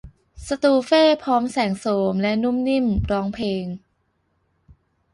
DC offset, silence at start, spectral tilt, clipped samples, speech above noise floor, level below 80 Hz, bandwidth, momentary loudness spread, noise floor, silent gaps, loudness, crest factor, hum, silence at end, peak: under 0.1%; 0.05 s; -6 dB/octave; under 0.1%; 48 dB; -42 dBFS; 11.5 kHz; 12 LU; -68 dBFS; none; -20 LUFS; 16 dB; none; 1.35 s; -6 dBFS